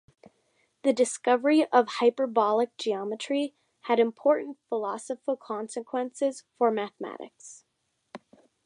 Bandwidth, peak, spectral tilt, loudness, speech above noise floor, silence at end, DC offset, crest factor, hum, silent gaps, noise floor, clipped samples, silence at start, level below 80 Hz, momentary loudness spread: 11 kHz; -8 dBFS; -3.5 dB/octave; -27 LUFS; 50 dB; 0.5 s; under 0.1%; 20 dB; none; none; -77 dBFS; under 0.1%; 0.85 s; -84 dBFS; 14 LU